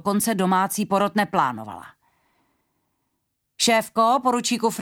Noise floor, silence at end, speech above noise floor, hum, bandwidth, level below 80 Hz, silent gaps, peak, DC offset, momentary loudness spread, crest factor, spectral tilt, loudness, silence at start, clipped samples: -76 dBFS; 0 s; 54 dB; none; 18 kHz; -66 dBFS; none; -6 dBFS; under 0.1%; 7 LU; 18 dB; -3.5 dB/octave; -21 LUFS; 0.05 s; under 0.1%